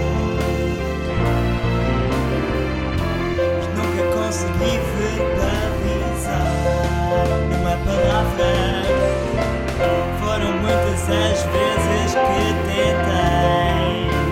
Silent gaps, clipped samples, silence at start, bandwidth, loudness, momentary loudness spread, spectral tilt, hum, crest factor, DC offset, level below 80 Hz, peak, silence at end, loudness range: none; under 0.1%; 0 s; 16.5 kHz; -20 LUFS; 4 LU; -6 dB/octave; none; 14 dB; under 0.1%; -26 dBFS; -6 dBFS; 0 s; 3 LU